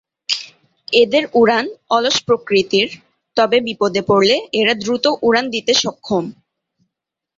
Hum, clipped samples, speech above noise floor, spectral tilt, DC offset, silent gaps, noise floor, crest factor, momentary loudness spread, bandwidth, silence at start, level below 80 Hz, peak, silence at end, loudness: none; under 0.1%; 67 dB; -3.5 dB/octave; under 0.1%; none; -83 dBFS; 18 dB; 8 LU; 7.8 kHz; 0.3 s; -58 dBFS; 0 dBFS; 1.05 s; -16 LUFS